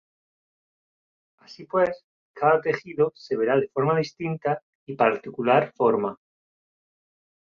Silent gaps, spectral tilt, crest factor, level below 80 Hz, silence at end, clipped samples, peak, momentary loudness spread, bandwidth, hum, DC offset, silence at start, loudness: 2.04-2.34 s, 4.62-4.87 s; -7.5 dB/octave; 20 dB; -68 dBFS; 1.35 s; under 0.1%; -6 dBFS; 8 LU; 7 kHz; none; under 0.1%; 1.5 s; -24 LUFS